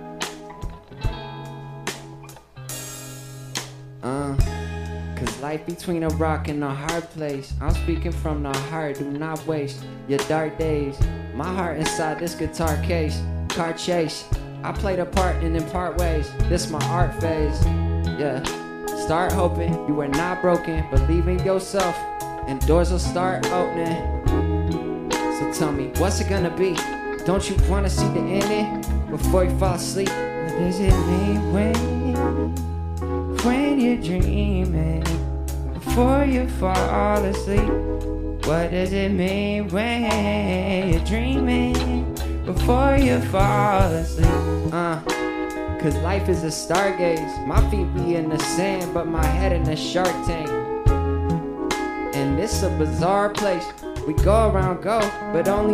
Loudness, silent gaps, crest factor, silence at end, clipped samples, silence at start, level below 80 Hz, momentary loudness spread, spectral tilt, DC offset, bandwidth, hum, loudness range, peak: -23 LUFS; none; 20 dB; 0 s; under 0.1%; 0 s; -28 dBFS; 10 LU; -6 dB/octave; under 0.1%; 15.5 kHz; none; 5 LU; -2 dBFS